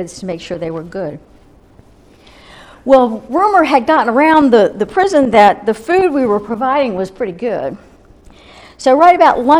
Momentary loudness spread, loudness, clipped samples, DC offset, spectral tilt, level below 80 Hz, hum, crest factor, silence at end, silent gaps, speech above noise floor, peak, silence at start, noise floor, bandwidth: 15 LU; -12 LUFS; 0.1%; under 0.1%; -5.5 dB/octave; -46 dBFS; none; 14 dB; 0 s; none; 32 dB; 0 dBFS; 0 s; -44 dBFS; 12.5 kHz